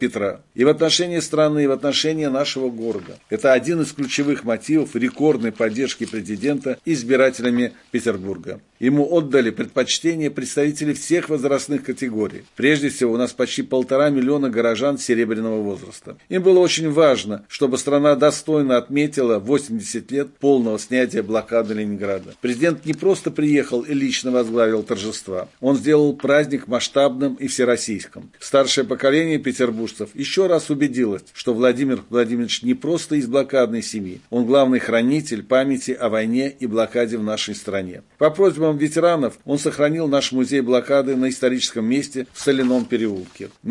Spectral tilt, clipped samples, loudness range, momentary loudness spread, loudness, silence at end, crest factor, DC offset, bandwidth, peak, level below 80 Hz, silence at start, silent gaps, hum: -4.5 dB/octave; under 0.1%; 2 LU; 9 LU; -20 LUFS; 0 s; 16 dB; under 0.1%; 11.5 kHz; -2 dBFS; -64 dBFS; 0 s; none; none